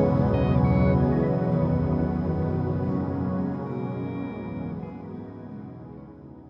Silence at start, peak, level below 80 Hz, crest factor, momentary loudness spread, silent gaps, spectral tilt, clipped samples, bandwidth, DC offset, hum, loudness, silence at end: 0 s; -10 dBFS; -40 dBFS; 16 dB; 18 LU; none; -11.5 dB/octave; under 0.1%; 5.6 kHz; under 0.1%; none; -25 LUFS; 0 s